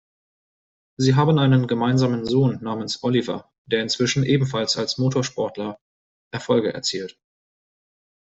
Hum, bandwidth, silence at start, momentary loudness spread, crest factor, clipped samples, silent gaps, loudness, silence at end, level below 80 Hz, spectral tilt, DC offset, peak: none; 8 kHz; 1 s; 13 LU; 18 dB; under 0.1%; 3.58-3.65 s, 5.81-6.31 s; -21 LUFS; 1.1 s; -58 dBFS; -5.5 dB/octave; under 0.1%; -6 dBFS